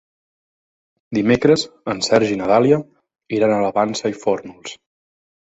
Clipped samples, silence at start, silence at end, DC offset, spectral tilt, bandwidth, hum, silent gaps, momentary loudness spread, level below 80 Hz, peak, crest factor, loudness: under 0.1%; 1.1 s; 0.75 s; under 0.1%; -5 dB/octave; 8.2 kHz; none; none; 11 LU; -54 dBFS; 0 dBFS; 18 dB; -18 LUFS